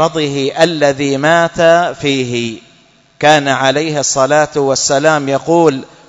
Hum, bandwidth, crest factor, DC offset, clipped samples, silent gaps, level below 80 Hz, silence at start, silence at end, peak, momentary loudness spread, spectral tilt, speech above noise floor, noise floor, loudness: none; 11 kHz; 12 dB; under 0.1%; 0.2%; none; -50 dBFS; 0 s; 0.25 s; 0 dBFS; 6 LU; -4 dB/octave; 36 dB; -48 dBFS; -12 LUFS